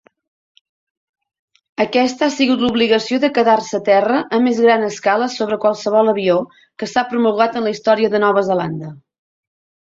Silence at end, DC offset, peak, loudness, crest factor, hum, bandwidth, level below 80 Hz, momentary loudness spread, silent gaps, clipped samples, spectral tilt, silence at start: 0.95 s; under 0.1%; -2 dBFS; -16 LUFS; 16 dB; none; 7.8 kHz; -60 dBFS; 7 LU; none; under 0.1%; -5 dB/octave; 1.8 s